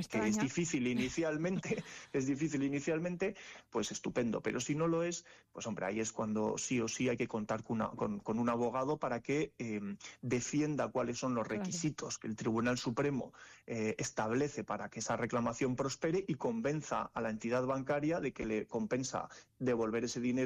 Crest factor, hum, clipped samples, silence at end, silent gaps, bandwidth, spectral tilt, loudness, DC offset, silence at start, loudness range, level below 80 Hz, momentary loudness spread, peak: 12 dB; none; under 0.1%; 0 s; none; 12.5 kHz; -5 dB/octave; -37 LUFS; under 0.1%; 0 s; 1 LU; -66 dBFS; 7 LU; -24 dBFS